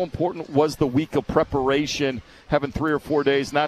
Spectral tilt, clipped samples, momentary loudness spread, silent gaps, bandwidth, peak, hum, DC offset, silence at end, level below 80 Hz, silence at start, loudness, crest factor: -5.5 dB/octave; under 0.1%; 5 LU; none; 14 kHz; -6 dBFS; none; under 0.1%; 0 s; -44 dBFS; 0 s; -23 LUFS; 18 dB